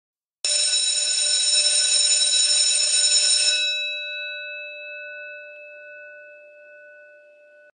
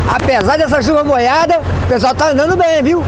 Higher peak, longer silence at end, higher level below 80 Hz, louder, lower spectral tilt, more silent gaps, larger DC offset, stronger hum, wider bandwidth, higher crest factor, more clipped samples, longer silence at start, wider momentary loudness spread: second, -6 dBFS vs 0 dBFS; first, 0.75 s vs 0 s; second, under -90 dBFS vs -32 dBFS; second, -17 LUFS vs -12 LUFS; second, 8 dB/octave vs -5.5 dB/octave; neither; neither; neither; first, 10.5 kHz vs 9.4 kHz; first, 18 dB vs 12 dB; neither; first, 0.45 s vs 0 s; first, 19 LU vs 2 LU